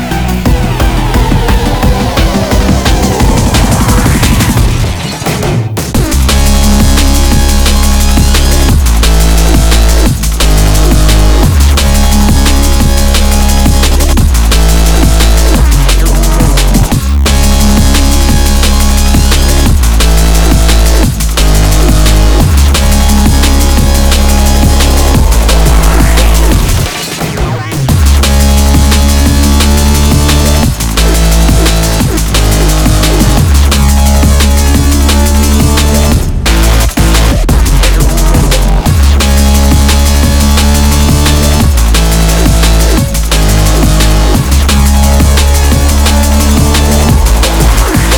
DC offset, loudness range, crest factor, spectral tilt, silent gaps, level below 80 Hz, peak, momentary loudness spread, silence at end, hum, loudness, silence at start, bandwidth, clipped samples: under 0.1%; 1 LU; 6 dB; -4.5 dB/octave; none; -8 dBFS; 0 dBFS; 3 LU; 0 s; none; -8 LUFS; 0 s; over 20 kHz; 2%